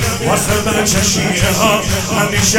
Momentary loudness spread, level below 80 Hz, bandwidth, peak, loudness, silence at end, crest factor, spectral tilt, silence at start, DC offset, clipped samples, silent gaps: 3 LU; -30 dBFS; 18 kHz; 0 dBFS; -13 LUFS; 0 s; 14 dB; -3.5 dB/octave; 0 s; under 0.1%; under 0.1%; none